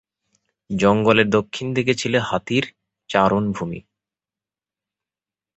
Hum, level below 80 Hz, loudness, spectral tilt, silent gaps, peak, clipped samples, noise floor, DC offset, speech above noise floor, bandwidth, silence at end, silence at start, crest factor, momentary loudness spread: none; -52 dBFS; -20 LUFS; -5.5 dB/octave; none; -2 dBFS; under 0.1%; under -90 dBFS; under 0.1%; over 71 dB; 8.2 kHz; 1.8 s; 0.7 s; 20 dB; 13 LU